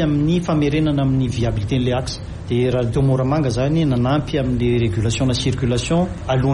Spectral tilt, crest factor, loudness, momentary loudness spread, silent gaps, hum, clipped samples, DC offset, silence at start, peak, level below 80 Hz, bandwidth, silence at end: -6.5 dB/octave; 8 dB; -19 LUFS; 3 LU; none; none; under 0.1%; under 0.1%; 0 s; -8 dBFS; -34 dBFS; 11.5 kHz; 0 s